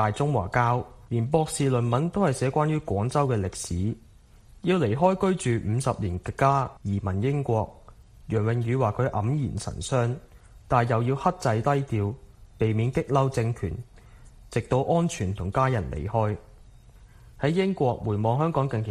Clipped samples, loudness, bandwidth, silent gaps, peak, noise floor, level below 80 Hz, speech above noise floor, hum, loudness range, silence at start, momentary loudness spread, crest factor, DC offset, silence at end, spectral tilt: under 0.1%; -26 LUFS; 12.5 kHz; none; -6 dBFS; -52 dBFS; -46 dBFS; 27 dB; none; 3 LU; 0 s; 7 LU; 18 dB; under 0.1%; 0 s; -7 dB/octave